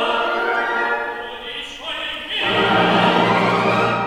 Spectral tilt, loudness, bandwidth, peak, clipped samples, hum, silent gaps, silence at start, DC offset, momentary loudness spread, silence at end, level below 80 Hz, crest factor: -5 dB/octave; -18 LUFS; 15.5 kHz; -2 dBFS; under 0.1%; none; none; 0 s; under 0.1%; 13 LU; 0 s; -52 dBFS; 16 dB